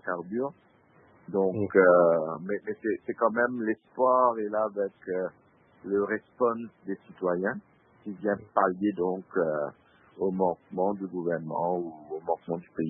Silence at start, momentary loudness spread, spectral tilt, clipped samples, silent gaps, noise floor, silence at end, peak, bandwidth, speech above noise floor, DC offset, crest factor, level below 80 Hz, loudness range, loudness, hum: 0.05 s; 14 LU; -11.5 dB/octave; under 0.1%; none; -60 dBFS; 0 s; -8 dBFS; 3.5 kHz; 32 dB; under 0.1%; 22 dB; -72 dBFS; 6 LU; -28 LUFS; none